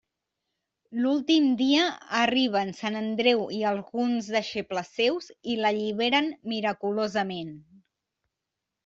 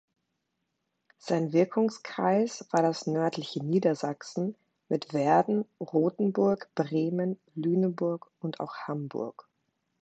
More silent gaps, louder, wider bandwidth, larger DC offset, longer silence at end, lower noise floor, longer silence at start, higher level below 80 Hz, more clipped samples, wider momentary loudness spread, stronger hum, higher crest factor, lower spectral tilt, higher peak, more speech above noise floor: neither; first, -26 LUFS vs -29 LUFS; second, 7.6 kHz vs 8.6 kHz; neither; first, 1.25 s vs 0.6 s; first, -86 dBFS vs -81 dBFS; second, 0.9 s vs 1.25 s; first, -72 dBFS vs -78 dBFS; neither; about the same, 9 LU vs 10 LU; neither; about the same, 18 dB vs 18 dB; second, -4.5 dB/octave vs -7 dB/octave; first, -8 dBFS vs -12 dBFS; first, 60 dB vs 53 dB